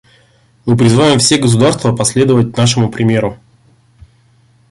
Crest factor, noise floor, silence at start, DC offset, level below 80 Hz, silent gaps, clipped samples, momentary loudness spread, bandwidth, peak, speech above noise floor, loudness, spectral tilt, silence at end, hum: 12 dB; -50 dBFS; 0.65 s; under 0.1%; -44 dBFS; none; under 0.1%; 7 LU; 11.5 kHz; 0 dBFS; 39 dB; -11 LUFS; -5 dB/octave; 1.35 s; none